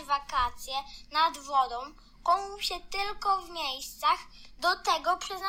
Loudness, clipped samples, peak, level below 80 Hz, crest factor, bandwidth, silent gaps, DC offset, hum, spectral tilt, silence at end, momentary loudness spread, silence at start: -30 LUFS; under 0.1%; -14 dBFS; -52 dBFS; 16 dB; 17 kHz; none; under 0.1%; none; -1 dB/octave; 0 s; 7 LU; 0 s